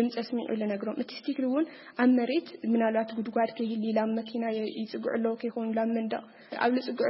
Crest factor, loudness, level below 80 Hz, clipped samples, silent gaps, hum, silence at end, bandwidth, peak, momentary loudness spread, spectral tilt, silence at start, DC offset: 18 dB; -30 LUFS; -80 dBFS; under 0.1%; none; none; 0 s; 5.8 kHz; -10 dBFS; 8 LU; -9.5 dB/octave; 0 s; under 0.1%